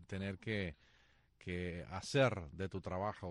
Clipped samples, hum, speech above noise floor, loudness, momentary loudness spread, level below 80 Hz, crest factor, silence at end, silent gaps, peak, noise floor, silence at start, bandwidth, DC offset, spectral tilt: under 0.1%; none; 31 dB; -40 LUFS; 12 LU; -62 dBFS; 20 dB; 0 s; none; -22 dBFS; -70 dBFS; 0 s; 10.5 kHz; under 0.1%; -6 dB/octave